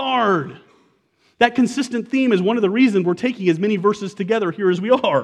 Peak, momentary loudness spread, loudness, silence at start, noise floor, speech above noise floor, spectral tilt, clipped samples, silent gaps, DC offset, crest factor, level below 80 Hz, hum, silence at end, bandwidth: 0 dBFS; 6 LU; -18 LUFS; 0 s; -61 dBFS; 44 dB; -6 dB/octave; under 0.1%; none; under 0.1%; 18 dB; -66 dBFS; none; 0 s; 11 kHz